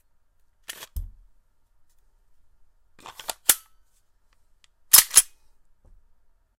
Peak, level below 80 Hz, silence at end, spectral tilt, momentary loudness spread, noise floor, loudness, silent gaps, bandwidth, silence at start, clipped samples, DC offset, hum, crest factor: 0 dBFS; -48 dBFS; 1.35 s; 1.5 dB/octave; 27 LU; -62 dBFS; -17 LUFS; none; 16 kHz; 0.95 s; under 0.1%; under 0.1%; none; 28 dB